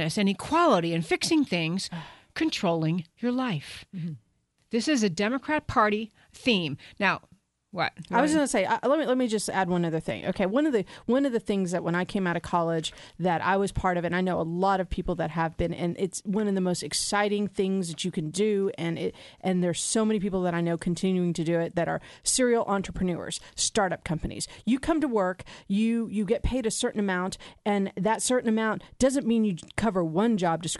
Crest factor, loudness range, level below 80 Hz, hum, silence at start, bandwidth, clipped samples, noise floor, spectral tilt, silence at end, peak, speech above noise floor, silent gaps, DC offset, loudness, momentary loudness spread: 18 dB; 2 LU; -48 dBFS; none; 0 s; 11.5 kHz; under 0.1%; -66 dBFS; -4.5 dB/octave; 0 s; -8 dBFS; 39 dB; none; under 0.1%; -27 LUFS; 7 LU